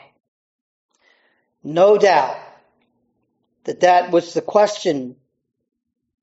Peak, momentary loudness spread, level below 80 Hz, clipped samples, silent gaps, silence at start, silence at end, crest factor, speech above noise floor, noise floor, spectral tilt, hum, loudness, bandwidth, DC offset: -2 dBFS; 20 LU; -74 dBFS; under 0.1%; none; 1.65 s; 1.1 s; 18 dB; 54 dB; -70 dBFS; -3 dB/octave; none; -17 LUFS; 8 kHz; under 0.1%